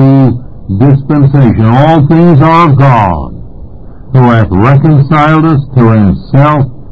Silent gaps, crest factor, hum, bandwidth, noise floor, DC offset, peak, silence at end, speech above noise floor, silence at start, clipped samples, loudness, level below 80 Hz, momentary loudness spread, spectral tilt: none; 6 dB; none; 5.2 kHz; -27 dBFS; under 0.1%; 0 dBFS; 0 s; 22 dB; 0 s; 7%; -6 LUFS; -26 dBFS; 7 LU; -10 dB/octave